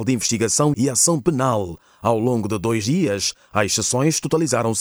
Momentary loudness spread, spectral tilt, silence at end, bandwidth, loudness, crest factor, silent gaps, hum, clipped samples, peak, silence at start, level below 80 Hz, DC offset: 6 LU; -4 dB/octave; 0 s; over 20 kHz; -19 LUFS; 18 dB; none; none; under 0.1%; -2 dBFS; 0 s; -54 dBFS; under 0.1%